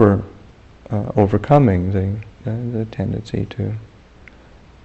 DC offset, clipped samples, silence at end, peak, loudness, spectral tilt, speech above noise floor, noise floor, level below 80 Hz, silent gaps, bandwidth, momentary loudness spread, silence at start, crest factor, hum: under 0.1%; under 0.1%; 1 s; 0 dBFS; -20 LUFS; -9.5 dB/octave; 27 dB; -45 dBFS; -42 dBFS; none; 8 kHz; 13 LU; 0 s; 18 dB; none